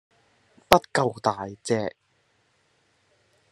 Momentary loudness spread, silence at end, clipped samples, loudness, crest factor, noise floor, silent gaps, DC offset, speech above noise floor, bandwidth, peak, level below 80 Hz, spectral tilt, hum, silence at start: 11 LU; 1.6 s; under 0.1%; -24 LUFS; 28 dB; -68 dBFS; none; under 0.1%; 43 dB; 12.5 kHz; 0 dBFS; -54 dBFS; -4.5 dB/octave; none; 0.7 s